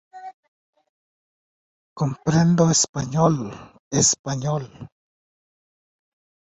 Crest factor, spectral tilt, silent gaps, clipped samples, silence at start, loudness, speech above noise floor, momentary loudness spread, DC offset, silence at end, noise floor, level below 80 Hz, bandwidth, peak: 20 dB; -4.5 dB/octave; 0.34-0.73 s, 0.89-1.96 s, 2.89-2.94 s, 3.79-3.91 s, 4.19-4.24 s; under 0.1%; 0.15 s; -20 LUFS; over 69 dB; 18 LU; under 0.1%; 1.65 s; under -90 dBFS; -54 dBFS; 8.4 kHz; -6 dBFS